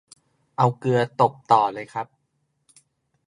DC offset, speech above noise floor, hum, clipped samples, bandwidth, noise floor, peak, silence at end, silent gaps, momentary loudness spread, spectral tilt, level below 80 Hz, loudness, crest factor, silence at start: under 0.1%; 51 dB; none; under 0.1%; 11 kHz; -72 dBFS; -2 dBFS; 1.25 s; none; 15 LU; -7 dB/octave; -70 dBFS; -22 LUFS; 22 dB; 0.6 s